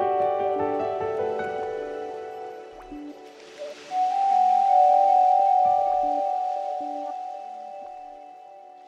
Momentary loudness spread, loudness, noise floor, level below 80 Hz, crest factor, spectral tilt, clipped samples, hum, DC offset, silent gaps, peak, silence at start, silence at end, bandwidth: 22 LU; -23 LUFS; -46 dBFS; -64 dBFS; 14 dB; -5 dB/octave; under 0.1%; none; under 0.1%; none; -10 dBFS; 0 s; 0 s; 7.8 kHz